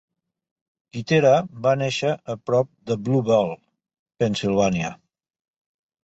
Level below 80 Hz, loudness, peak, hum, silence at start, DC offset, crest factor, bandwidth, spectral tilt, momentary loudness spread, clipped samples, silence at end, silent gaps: -56 dBFS; -22 LUFS; -6 dBFS; none; 0.95 s; under 0.1%; 18 dB; 8.2 kHz; -6 dB/octave; 11 LU; under 0.1%; 1.1 s; 3.99-4.06 s